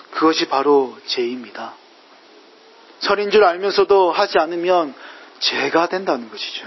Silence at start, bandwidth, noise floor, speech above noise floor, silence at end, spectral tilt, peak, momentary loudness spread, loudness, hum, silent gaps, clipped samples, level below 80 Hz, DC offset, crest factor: 0.1 s; 6.2 kHz; -47 dBFS; 30 dB; 0 s; -3.5 dB/octave; -2 dBFS; 15 LU; -18 LUFS; none; none; under 0.1%; -64 dBFS; under 0.1%; 18 dB